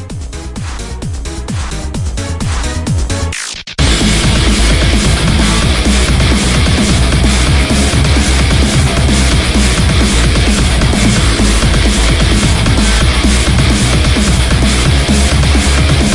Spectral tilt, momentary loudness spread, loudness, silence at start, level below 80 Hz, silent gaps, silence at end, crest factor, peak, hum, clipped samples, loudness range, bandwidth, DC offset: -4.5 dB/octave; 9 LU; -11 LUFS; 0 s; -14 dBFS; none; 0 s; 10 dB; 0 dBFS; none; under 0.1%; 5 LU; 11.5 kHz; under 0.1%